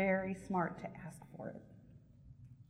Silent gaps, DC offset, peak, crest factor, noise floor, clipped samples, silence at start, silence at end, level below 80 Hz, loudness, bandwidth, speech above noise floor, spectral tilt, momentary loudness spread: none; under 0.1%; -22 dBFS; 20 dB; -60 dBFS; under 0.1%; 0 s; 0.05 s; -66 dBFS; -41 LUFS; 12 kHz; 19 dB; -8 dB/octave; 23 LU